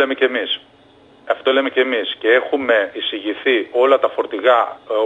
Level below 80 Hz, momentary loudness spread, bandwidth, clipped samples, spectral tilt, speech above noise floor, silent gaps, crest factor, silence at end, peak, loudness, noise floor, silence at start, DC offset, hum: -68 dBFS; 7 LU; 7.8 kHz; under 0.1%; -4 dB/octave; 31 dB; none; 18 dB; 0 s; 0 dBFS; -17 LUFS; -48 dBFS; 0 s; under 0.1%; none